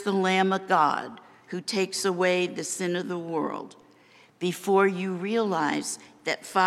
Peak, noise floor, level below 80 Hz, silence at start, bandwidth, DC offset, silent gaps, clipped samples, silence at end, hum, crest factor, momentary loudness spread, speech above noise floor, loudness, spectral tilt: -8 dBFS; -57 dBFS; -82 dBFS; 0 s; 15 kHz; under 0.1%; none; under 0.1%; 0 s; none; 20 dB; 11 LU; 31 dB; -26 LUFS; -4 dB/octave